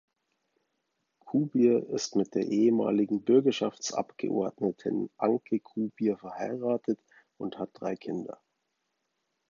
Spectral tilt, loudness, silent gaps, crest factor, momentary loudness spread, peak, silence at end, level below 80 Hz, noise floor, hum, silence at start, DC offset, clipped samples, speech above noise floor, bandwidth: -6 dB/octave; -29 LUFS; none; 18 dB; 12 LU; -12 dBFS; 1.2 s; -76 dBFS; -80 dBFS; none; 1.25 s; under 0.1%; under 0.1%; 52 dB; 7.4 kHz